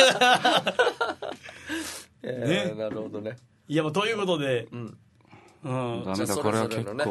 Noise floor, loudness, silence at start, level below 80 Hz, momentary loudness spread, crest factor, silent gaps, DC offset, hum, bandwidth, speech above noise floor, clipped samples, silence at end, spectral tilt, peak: -54 dBFS; -26 LUFS; 0 s; -66 dBFS; 17 LU; 22 dB; none; under 0.1%; none; 12.5 kHz; 28 dB; under 0.1%; 0 s; -4 dB/octave; -6 dBFS